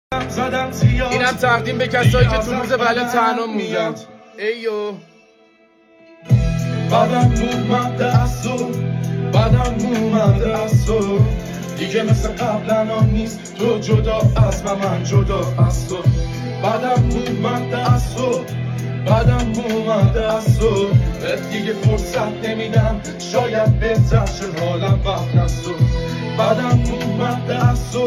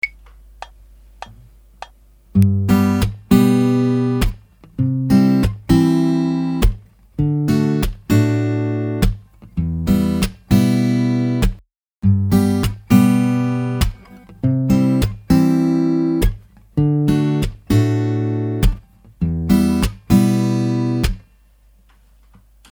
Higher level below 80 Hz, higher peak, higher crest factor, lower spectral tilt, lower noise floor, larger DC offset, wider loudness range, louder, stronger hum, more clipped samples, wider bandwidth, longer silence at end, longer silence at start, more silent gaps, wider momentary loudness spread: about the same, -28 dBFS vs -28 dBFS; about the same, 0 dBFS vs 0 dBFS; about the same, 16 dB vs 18 dB; about the same, -6.5 dB/octave vs -7.5 dB/octave; about the same, -52 dBFS vs -51 dBFS; neither; about the same, 2 LU vs 3 LU; about the same, -18 LUFS vs -17 LUFS; neither; neither; second, 13.5 kHz vs over 20 kHz; second, 0 s vs 1.5 s; about the same, 0.1 s vs 0.05 s; second, none vs 11.93-11.97 s; about the same, 7 LU vs 9 LU